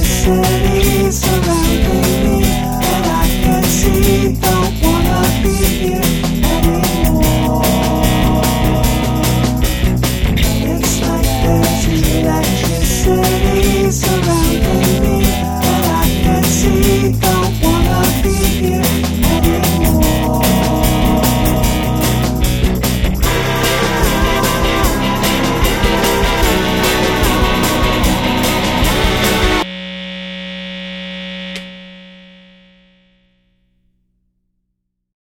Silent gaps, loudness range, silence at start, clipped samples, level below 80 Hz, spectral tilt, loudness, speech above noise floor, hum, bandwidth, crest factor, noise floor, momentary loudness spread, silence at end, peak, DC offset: none; 3 LU; 0 s; under 0.1%; -20 dBFS; -5 dB/octave; -13 LUFS; 58 dB; none; over 20 kHz; 14 dB; -71 dBFS; 3 LU; 3.1 s; 0 dBFS; under 0.1%